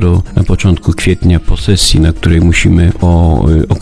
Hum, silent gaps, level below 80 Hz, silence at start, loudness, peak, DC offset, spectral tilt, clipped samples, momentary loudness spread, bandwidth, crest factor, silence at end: none; none; -16 dBFS; 0 s; -10 LUFS; 0 dBFS; under 0.1%; -5.5 dB/octave; 0.8%; 4 LU; 11 kHz; 8 dB; 0 s